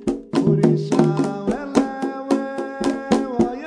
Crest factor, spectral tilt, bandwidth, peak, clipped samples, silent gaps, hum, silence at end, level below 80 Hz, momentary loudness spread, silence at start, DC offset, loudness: 20 dB; -7 dB/octave; 11 kHz; 0 dBFS; under 0.1%; none; none; 0 s; -50 dBFS; 8 LU; 0 s; under 0.1%; -21 LUFS